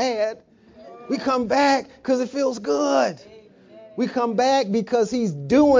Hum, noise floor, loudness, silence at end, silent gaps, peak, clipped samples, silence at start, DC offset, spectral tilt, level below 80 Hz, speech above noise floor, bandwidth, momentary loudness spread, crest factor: none; -49 dBFS; -22 LUFS; 0 s; none; -6 dBFS; under 0.1%; 0 s; under 0.1%; -5 dB/octave; -56 dBFS; 29 dB; 7.6 kHz; 9 LU; 16 dB